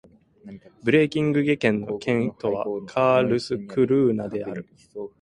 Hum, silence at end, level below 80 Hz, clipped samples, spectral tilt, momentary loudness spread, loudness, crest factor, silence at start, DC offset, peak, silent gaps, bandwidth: none; 0.15 s; -60 dBFS; under 0.1%; -7 dB/octave; 14 LU; -23 LUFS; 20 dB; 0.45 s; under 0.1%; -4 dBFS; none; 11 kHz